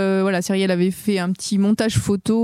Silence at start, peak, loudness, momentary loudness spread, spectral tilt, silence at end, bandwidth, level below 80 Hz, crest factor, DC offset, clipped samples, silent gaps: 0 s; -6 dBFS; -20 LUFS; 4 LU; -5.5 dB/octave; 0 s; 15.5 kHz; -48 dBFS; 12 dB; under 0.1%; under 0.1%; none